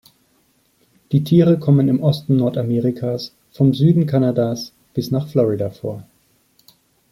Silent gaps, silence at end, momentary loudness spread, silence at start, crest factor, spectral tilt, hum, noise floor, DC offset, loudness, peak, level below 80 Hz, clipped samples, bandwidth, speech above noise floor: none; 1.1 s; 13 LU; 1.1 s; 16 dB; -8.5 dB/octave; none; -60 dBFS; under 0.1%; -18 LUFS; -2 dBFS; -56 dBFS; under 0.1%; 15 kHz; 44 dB